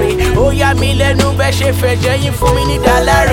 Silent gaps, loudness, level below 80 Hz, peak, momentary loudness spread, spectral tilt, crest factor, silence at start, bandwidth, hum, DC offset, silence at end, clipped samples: none; -12 LUFS; -20 dBFS; 0 dBFS; 3 LU; -5 dB/octave; 10 dB; 0 s; 17 kHz; none; under 0.1%; 0 s; under 0.1%